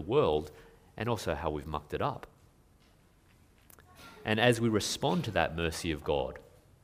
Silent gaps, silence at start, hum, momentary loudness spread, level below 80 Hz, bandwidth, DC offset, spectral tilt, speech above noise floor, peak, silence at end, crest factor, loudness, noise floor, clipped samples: none; 0 s; none; 20 LU; -52 dBFS; 15.5 kHz; under 0.1%; -5 dB/octave; 32 dB; -8 dBFS; 0.45 s; 24 dB; -32 LUFS; -63 dBFS; under 0.1%